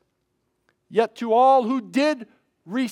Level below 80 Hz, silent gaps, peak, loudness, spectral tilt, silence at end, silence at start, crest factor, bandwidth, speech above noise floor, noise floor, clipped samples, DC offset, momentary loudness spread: -84 dBFS; none; -6 dBFS; -21 LUFS; -5 dB/octave; 0 s; 0.9 s; 16 dB; 12 kHz; 53 dB; -73 dBFS; under 0.1%; under 0.1%; 12 LU